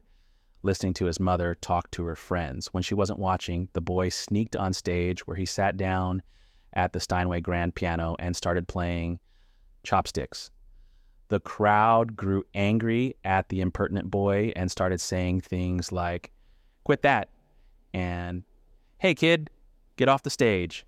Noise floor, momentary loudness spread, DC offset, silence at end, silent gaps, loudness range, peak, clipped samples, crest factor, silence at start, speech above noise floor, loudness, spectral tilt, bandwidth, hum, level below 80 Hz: -60 dBFS; 11 LU; under 0.1%; 0.05 s; none; 4 LU; -8 dBFS; under 0.1%; 20 dB; 0.65 s; 34 dB; -27 LUFS; -5.5 dB/octave; 14.5 kHz; none; -48 dBFS